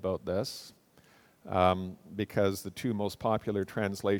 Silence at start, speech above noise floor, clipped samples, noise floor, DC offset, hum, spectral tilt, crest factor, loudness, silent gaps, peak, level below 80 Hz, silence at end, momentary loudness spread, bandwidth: 0 s; 31 dB; under 0.1%; -62 dBFS; under 0.1%; none; -6 dB/octave; 22 dB; -32 LUFS; none; -10 dBFS; -62 dBFS; 0 s; 11 LU; 19 kHz